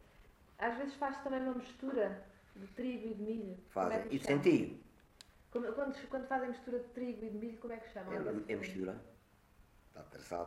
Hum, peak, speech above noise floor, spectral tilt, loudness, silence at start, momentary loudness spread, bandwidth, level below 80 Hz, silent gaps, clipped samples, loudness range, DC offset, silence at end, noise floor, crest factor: none; -18 dBFS; 27 dB; -6.5 dB/octave; -39 LUFS; 0.2 s; 16 LU; 14 kHz; -66 dBFS; none; under 0.1%; 6 LU; under 0.1%; 0 s; -66 dBFS; 22 dB